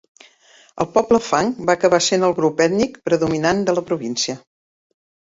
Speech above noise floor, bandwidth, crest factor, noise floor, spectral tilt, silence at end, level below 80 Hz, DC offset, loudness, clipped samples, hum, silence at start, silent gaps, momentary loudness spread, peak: 34 dB; 8 kHz; 18 dB; -52 dBFS; -4 dB/octave; 0.95 s; -54 dBFS; under 0.1%; -18 LUFS; under 0.1%; none; 0.75 s; none; 7 LU; -2 dBFS